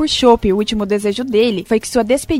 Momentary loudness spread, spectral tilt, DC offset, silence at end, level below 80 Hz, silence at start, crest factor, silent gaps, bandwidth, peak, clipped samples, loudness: 6 LU; -4.5 dB/octave; under 0.1%; 0 s; -36 dBFS; 0 s; 14 dB; none; 16 kHz; 0 dBFS; under 0.1%; -15 LUFS